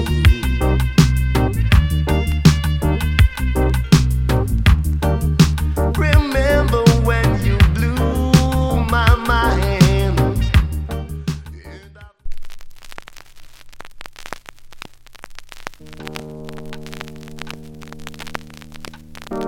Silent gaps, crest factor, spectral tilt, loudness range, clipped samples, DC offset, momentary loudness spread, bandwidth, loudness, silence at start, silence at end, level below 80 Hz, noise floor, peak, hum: none; 18 dB; -6 dB/octave; 19 LU; under 0.1%; under 0.1%; 21 LU; 16.5 kHz; -16 LUFS; 0 s; 0 s; -22 dBFS; -41 dBFS; 0 dBFS; none